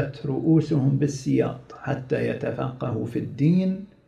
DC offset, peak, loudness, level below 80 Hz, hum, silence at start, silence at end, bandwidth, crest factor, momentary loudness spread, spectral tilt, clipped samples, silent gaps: under 0.1%; -8 dBFS; -24 LUFS; -56 dBFS; none; 0 s; 0.2 s; 10.5 kHz; 16 dB; 9 LU; -8 dB/octave; under 0.1%; none